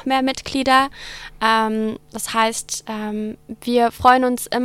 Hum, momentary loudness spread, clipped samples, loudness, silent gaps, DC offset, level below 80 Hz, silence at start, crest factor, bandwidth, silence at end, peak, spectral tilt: none; 13 LU; under 0.1%; -19 LUFS; none; under 0.1%; -48 dBFS; 0.05 s; 18 dB; 16.5 kHz; 0 s; 0 dBFS; -3 dB/octave